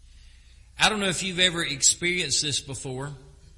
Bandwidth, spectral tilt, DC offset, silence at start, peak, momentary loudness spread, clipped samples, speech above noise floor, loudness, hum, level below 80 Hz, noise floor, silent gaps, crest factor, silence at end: 11.5 kHz; -1.5 dB/octave; under 0.1%; 0.15 s; -2 dBFS; 14 LU; under 0.1%; 25 dB; -23 LUFS; none; -50 dBFS; -51 dBFS; none; 26 dB; 0.3 s